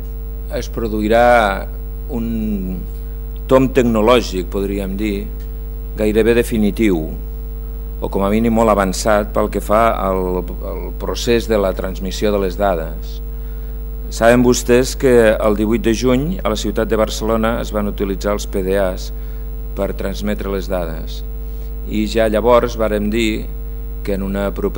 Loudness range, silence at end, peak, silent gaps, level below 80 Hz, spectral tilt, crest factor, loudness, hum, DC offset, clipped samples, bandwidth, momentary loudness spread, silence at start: 6 LU; 0 s; 0 dBFS; none; -24 dBFS; -5.5 dB/octave; 16 dB; -17 LUFS; 50 Hz at -25 dBFS; under 0.1%; under 0.1%; over 20 kHz; 16 LU; 0 s